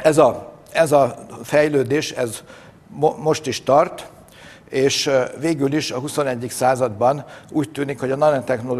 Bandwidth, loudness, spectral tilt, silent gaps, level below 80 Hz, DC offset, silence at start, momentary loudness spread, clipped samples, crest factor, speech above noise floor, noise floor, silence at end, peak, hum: 13.5 kHz; -19 LUFS; -4.5 dB/octave; none; -56 dBFS; under 0.1%; 0 s; 10 LU; under 0.1%; 18 dB; 25 dB; -44 dBFS; 0 s; 0 dBFS; none